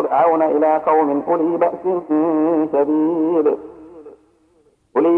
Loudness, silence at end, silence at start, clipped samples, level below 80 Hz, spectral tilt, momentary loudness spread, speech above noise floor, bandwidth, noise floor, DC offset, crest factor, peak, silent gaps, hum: -17 LUFS; 0 s; 0 s; under 0.1%; -62 dBFS; -9.5 dB/octave; 6 LU; 41 dB; 3.3 kHz; -58 dBFS; under 0.1%; 14 dB; -4 dBFS; none; none